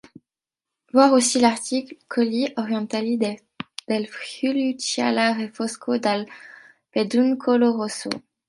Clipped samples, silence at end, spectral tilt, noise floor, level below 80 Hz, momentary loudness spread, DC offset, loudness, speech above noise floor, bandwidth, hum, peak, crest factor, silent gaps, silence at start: under 0.1%; 0.3 s; -3.5 dB/octave; -88 dBFS; -70 dBFS; 12 LU; under 0.1%; -22 LUFS; 67 dB; 11.5 kHz; none; -2 dBFS; 20 dB; none; 0.95 s